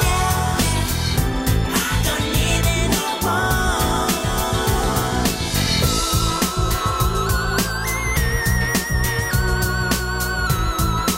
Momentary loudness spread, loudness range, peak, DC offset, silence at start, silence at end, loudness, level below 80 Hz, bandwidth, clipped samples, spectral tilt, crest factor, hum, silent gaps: 2 LU; 1 LU; -4 dBFS; under 0.1%; 0 s; 0 s; -19 LUFS; -26 dBFS; 16.5 kHz; under 0.1%; -4 dB/octave; 16 dB; none; none